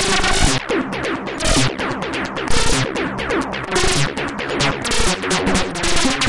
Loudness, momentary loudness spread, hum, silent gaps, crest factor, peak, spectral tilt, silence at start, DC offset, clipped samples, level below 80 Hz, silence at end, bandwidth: -19 LUFS; 6 LU; none; none; 14 dB; -4 dBFS; -3 dB/octave; 0 s; under 0.1%; under 0.1%; -28 dBFS; 0 s; 11.5 kHz